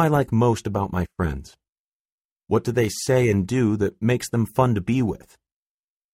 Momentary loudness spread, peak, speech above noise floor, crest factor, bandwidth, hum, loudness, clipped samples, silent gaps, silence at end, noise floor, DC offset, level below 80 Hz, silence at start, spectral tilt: 8 LU; -6 dBFS; over 69 dB; 18 dB; 16 kHz; none; -22 LUFS; under 0.1%; 1.79-2.05 s, 2.12-2.36 s; 0.95 s; under -90 dBFS; under 0.1%; -44 dBFS; 0 s; -6.5 dB/octave